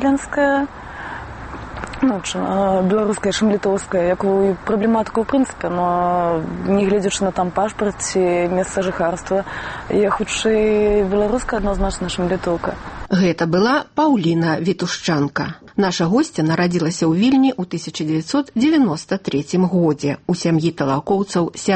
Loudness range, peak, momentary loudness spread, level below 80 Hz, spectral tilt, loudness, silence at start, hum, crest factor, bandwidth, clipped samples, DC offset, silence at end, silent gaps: 2 LU; -6 dBFS; 7 LU; -38 dBFS; -5.5 dB/octave; -18 LUFS; 0 s; none; 12 dB; 8.8 kHz; under 0.1%; under 0.1%; 0 s; none